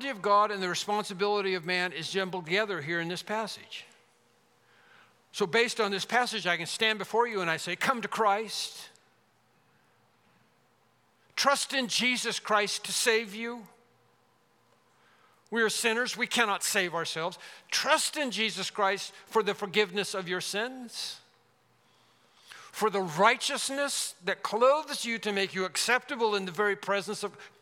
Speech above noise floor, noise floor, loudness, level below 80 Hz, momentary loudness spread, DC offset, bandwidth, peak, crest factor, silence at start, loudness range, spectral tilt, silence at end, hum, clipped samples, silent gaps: 38 dB; -68 dBFS; -29 LUFS; -90 dBFS; 11 LU; under 0.1%; 17.5 kHz; -6 dBFS; 24 dB; 0 s; 6 LU; -2 dB/octave; 0.15 s; none; under 0.1%; none